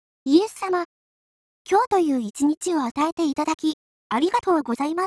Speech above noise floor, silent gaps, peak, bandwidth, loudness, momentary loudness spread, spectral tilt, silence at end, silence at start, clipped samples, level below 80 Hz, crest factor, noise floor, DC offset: over 68 dB; 0.85-1.65 s, 1.87-1.91 s, 2.57-2.61 s, 2.91-2.95 s, 3.12-3.17 s, 3.54-3.58 s, 3.73-4.10 s; -6 dBFS; 11 kHz; -23 LUFS; 7 LU; -4 dB/octave; 0 s; 0.25 s; under 0.1%; -64 dBFS; 18 dB; under -90 dBFS; under 0.1%